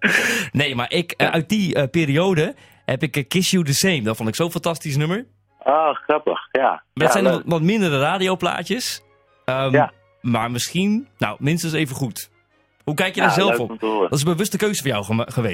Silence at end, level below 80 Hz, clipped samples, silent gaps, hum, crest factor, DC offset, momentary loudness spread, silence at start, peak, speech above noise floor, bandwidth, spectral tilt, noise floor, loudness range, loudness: 0 s; -56 dBFS; under 0.1%; none; none; 18 dB; under 0.1%; 8 LU; 0 s; -2 dBFS; 41 dB; 16.5 kHz; -4.5 dB/octave; -60 dBFS; 2 LU; -20 LUFS